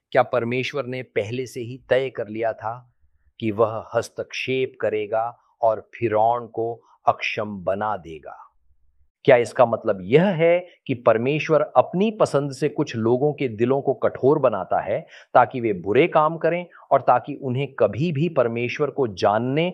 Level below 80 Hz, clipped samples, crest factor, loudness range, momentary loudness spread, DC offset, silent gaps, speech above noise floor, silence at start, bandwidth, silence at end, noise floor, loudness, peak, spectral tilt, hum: -64 dBFS; under 0.1%; 20 dB; 6 LU; 10 LU; under 0.1%; 9.10-9.15 s; 37 dB; 0.1 s; 12 kHz; 0 s; -59 dBFS; -22 LUFS; -2 dBFS; -7 dB/octave; none